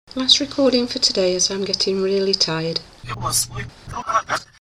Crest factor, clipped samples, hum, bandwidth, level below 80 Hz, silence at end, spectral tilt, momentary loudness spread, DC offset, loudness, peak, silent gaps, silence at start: 20 dB; under 0.1%; none; 16 kHz; -48 dBFS; 0.25 s; -2.5 dB/octave; 13 LU; under 0.1%; -19 LUFS; 0 dBFS; none; 0.15 s